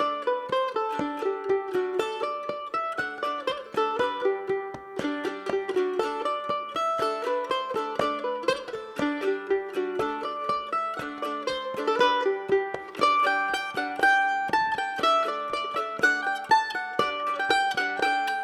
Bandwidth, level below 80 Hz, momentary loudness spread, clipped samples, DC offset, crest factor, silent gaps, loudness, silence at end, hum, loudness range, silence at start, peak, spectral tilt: 14 kHz; -66 dBFS; 8 LU; under 0.1%; under 0.1%; 20 dB; none; -27 LUFS; 0 s; none; 5 LU; 0 s; -8 dBFS; -3.5 dB/octave